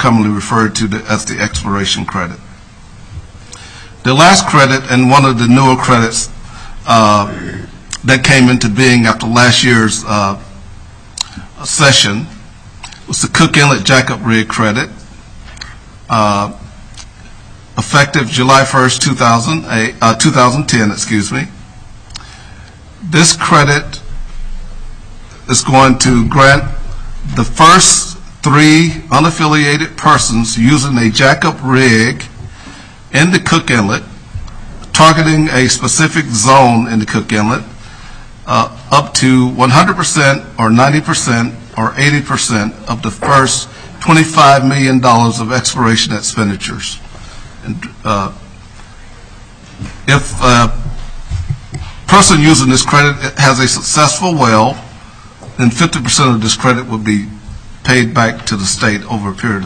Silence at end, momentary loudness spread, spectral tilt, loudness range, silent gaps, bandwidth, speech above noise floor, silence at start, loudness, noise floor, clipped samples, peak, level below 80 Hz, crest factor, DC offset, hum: 0 s; 18 LU; -4 dB/octave; 7 LU; none; 11 kHz; 25 dB; 0 s; -10 LUFS; -35 dBFS; 0.4%; 0 dBFS; -30 dBFS; 12 dB; under 0.1%; none